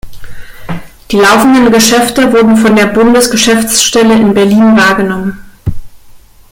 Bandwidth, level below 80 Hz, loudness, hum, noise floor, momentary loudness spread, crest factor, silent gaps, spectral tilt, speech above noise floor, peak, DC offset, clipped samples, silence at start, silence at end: 17.5 kHz; -32 dBFS; -6 LUFS; none; -34 dBFS; 15 LU; 8 dB; none; -3.5 dB/octave; 28 dB; 0 dBFS; under 0.1%; 0.1%; 0.05 s; 0.35 s